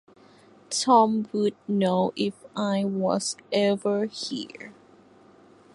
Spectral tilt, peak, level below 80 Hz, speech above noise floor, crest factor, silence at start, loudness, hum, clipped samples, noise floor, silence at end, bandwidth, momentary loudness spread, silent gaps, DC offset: -5 dB/octave; -6 dBFS; -70 dBFS; 30 dB; 20 dB; 0.7 s; -25 LUFS; none; under 0.1%; -54 dBFS; 1.05 s; 11.5 kHz; 13 LU; none; under 0.1%